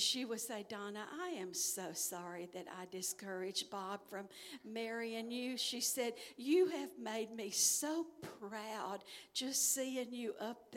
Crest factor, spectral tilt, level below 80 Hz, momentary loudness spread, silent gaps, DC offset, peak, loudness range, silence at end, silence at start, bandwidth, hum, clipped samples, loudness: 20 dB; -1.5 dB/octave; -88 dBFS; 14 LU; none; under 0.1%; -20 dBFS; 6 LU; 0 s; 0 s; 17 kHz; none; under 0.1%; -40 LUFS